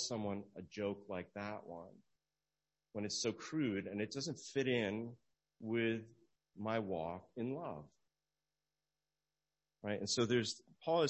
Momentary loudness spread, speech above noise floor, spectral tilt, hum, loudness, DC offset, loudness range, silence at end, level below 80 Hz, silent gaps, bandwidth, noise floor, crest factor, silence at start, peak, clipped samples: 13 LU; over 49 dB; -4.5 dB/octave; 50 Hz at -70 dBFS; -41 LUFS; under 0.1%; 6 LU; 0 s; -74 dBFS; none; 8.2 kHz; under -90 dBFS; 20 dB; 0 s; -22 dBFS; under 0.1%